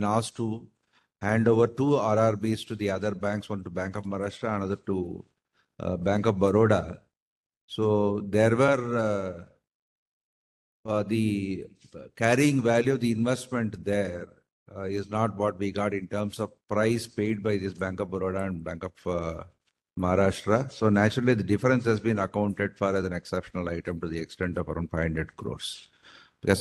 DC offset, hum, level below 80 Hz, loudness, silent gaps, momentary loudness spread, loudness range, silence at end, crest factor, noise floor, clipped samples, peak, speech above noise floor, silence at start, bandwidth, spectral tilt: under 0.1%; none; -54 dBFS; -27 LUFS; 7.17-7.50 s, 7.57-7.68 s, 9.75-10.84 s, 14.52-14.66 s; 13 LU; 6 LU; 0 s; 22 dB; -55 dBFS; under 0.1%; -6 dBFS; 29 dB; 0 s; 12.5 kHz; -6.5 dB/octave